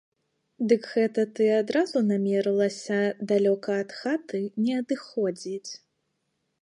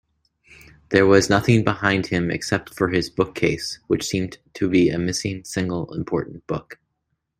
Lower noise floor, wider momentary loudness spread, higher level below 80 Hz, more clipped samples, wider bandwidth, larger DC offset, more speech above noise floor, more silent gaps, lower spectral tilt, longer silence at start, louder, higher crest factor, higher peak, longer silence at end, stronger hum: about the same, -77 dBFS vs -75 dBFS; second, 9 LU vs 12 LU; second, -80 dBFS vs -50 dBFS; neither; second, 10.5 kHz vs 16 kHz; neither; about the same, 51 dB vs 54 dB; neither; about the same, -6 dB/octave vs -5.5 dB/octave; second, 0.6 s vs 0.9 s; second, -26 LUFS vs -21 LUFS; about the same, 18 dB vs 20 dB; second, -8 dBFS vs -2 dBFS; first, 0.85 s vs 0.65 s; neither